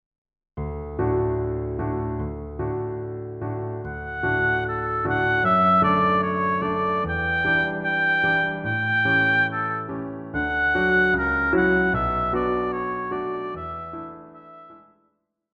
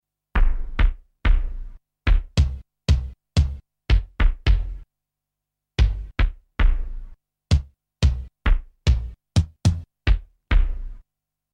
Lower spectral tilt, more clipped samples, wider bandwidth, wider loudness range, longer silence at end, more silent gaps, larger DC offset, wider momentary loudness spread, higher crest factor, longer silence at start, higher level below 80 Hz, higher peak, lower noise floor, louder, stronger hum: first, -8 dB/octave vs -6 dB/octave; neither; second, 6.6 kHz vs 9.4 kHz; first, 7 LU vs 2 LU; first, 0.75 s vs 0.55 s; neither; neither; first, 13 LU vs 9 LU; about the same, 16 dB vs 16 dB; first, 0.55 s vs 0.35 s; second, -42 dBFS vs -22 dBFS; about the same, -8 dBFS vs -6 dBFS; second, -70 dBFS vs -85 dBFS; about the same, -23 LUFS vs -25 LUFS; neither